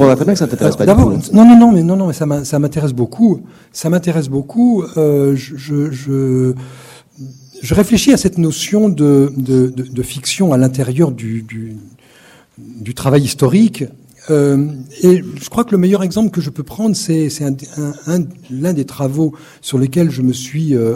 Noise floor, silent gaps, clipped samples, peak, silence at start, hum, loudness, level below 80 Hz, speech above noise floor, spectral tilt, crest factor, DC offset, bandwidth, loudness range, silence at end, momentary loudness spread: -45 dBFS; none; 0.4%; 0 dBFS; 0 s; none; -13 LUFS; -38 dBFS; 32 dB; -6.5 dB/octave; 12 dB; under 0.1%; 16 kHz; 7 LU; 0 s; 12 LU